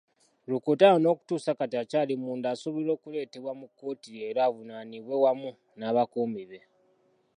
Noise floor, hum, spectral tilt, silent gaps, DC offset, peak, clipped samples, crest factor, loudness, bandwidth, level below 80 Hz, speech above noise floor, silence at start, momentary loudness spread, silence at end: -68 dBFS; none; -6.5 dB/octave; none; under 0.1%; -6 dBFS; under 0.1%; 22 dB; -28 LUFS; 10.5 kHz; -84 dBFS; 40 dB; 0.5 s; 18 LU; 0.8 s